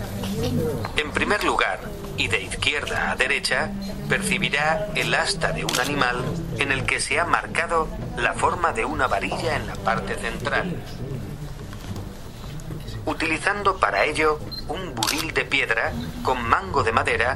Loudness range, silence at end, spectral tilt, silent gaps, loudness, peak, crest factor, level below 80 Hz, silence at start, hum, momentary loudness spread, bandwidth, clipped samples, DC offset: 6 LU; 0 s; -4 dB/octave; none; -23 LUFS; -2 dBFS; 22 dB; -38 dBFS; 0 s; none; 12 LU; 16 kHz; under 0.1%; under 0.1%